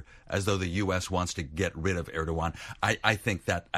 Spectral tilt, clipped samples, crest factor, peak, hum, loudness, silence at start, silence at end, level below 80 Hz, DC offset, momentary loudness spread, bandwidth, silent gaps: -4.5 dB/octave; under 0.1%; 24 dB; -6 dBFS; none; -30 LUFS; 0 s; 0 s; -46 dBFS; under 0.1%; 6 LU; 15 kHz; none